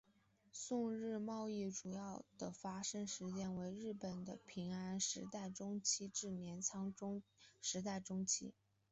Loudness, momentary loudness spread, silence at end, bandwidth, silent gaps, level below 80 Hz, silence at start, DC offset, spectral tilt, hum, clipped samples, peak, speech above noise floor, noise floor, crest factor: -45 LUFS; 10 LU; 0.4 s; 8.2 kHz; none; -78 dBFS; 0.55 s; under 0.1%; -4 dB/octave; none; under 0.1%; -26 dBFS; 30 dB; -76 dBFS; 20 dB